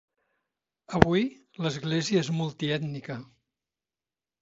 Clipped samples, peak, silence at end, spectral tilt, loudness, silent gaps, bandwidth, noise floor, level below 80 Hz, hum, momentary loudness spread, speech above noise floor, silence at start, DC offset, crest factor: under 0.1%; -2 dBFS; 1.15 s; -6 dB/octave; -28 LUFS; none; 8 kHz; under -90 dBFS; -48 dBFS; none; 13 LU; over 63 dB; 0.9 s; under 0.1%; 28 dB